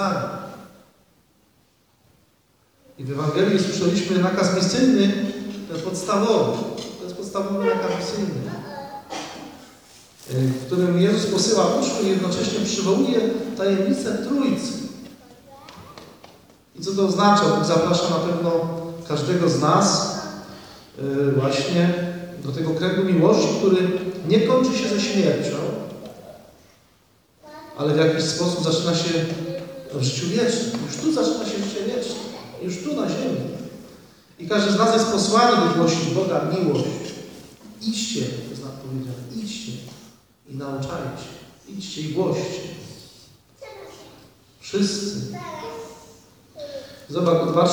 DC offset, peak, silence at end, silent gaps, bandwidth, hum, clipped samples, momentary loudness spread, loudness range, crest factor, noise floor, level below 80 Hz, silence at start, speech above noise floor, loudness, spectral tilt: under 0.1%; -4 dBFS; 0 s; none; over 20 kHz; none; under 0.1%; 20 LU; 10 LU; 18 dB; -61 dBFS; -60 dBFS; 0 s; 41 dB; -22 LUFS; -5 dB/octave